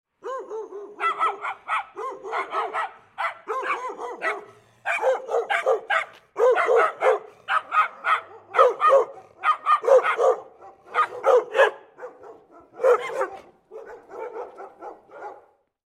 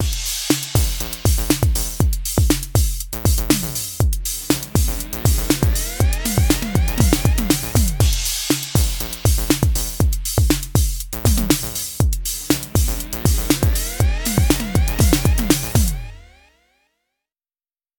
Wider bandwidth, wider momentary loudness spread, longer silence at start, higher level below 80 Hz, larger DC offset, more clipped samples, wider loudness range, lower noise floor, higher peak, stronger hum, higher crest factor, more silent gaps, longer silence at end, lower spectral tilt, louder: second, 11.5 kHz vs over 20 kHz; first, 22 LU vs 4 LU; first, 0.25 s vs 0 s; second, -78 dBFS vs -22 dBFS; neither; neither; first, 8 LU vs 2 LU; second, -54 dBFS vs under -90 dBFS; second, -4 dBFS vs 0 dBFS; neither; about the same, 22 dB vs 18 dB; neither; second, 0.55 s vs 1.75 s; second, -2 dB/octave vs -4.5 dB/octave; second, -23 LUFS vs -19 LUFS